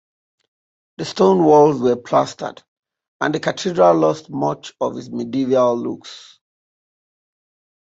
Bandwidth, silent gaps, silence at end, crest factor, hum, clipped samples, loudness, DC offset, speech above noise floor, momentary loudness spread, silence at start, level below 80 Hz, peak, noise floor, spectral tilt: 8 kHz; 2.68-2.83 s, 3.08-3.20 s; 1.65 s; 18 dB; none; under 0.1%; -17 LUFS; under 0.1%; over 73 dB; 16 LU; 1 s; -62 dBFS; -2 dBFS; under -90 dBFS; -6 dB/octave